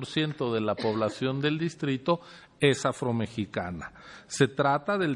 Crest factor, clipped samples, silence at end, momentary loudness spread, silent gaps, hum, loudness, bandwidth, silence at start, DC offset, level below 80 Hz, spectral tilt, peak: 20 dB; under 0.1%; 0 s; 10 LU; none; none; -28 LUFS; 11.5 kHz; 0 s; under 0.1%; -64 dBFS; -5.5 dB/octave; -8 dBFS